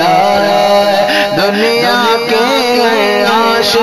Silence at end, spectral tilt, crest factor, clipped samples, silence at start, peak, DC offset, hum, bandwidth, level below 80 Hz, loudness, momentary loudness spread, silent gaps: 0 s; -3.5 dB/octave; 10 dB; under 0.1%; 0 s; 0 dBFS; 0.7%; none; 15.5 kHz; -46 dBFS; -10 LUFS; 2 LU; none